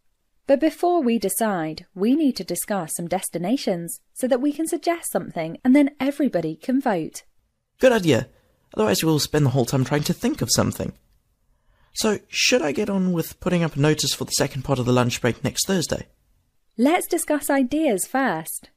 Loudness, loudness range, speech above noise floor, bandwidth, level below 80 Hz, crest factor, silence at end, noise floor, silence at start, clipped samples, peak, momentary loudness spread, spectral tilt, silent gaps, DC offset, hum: -22 LUFS; 2 LU; 44 dB; 15.5 kHz; -52 dBFS; 20 dB; 0.2 s; -65 dBFS; 0.5 s; under 0.1%; -2 dBFS; 9 LU; -4.5 dB/octave; none; under 0.1%; none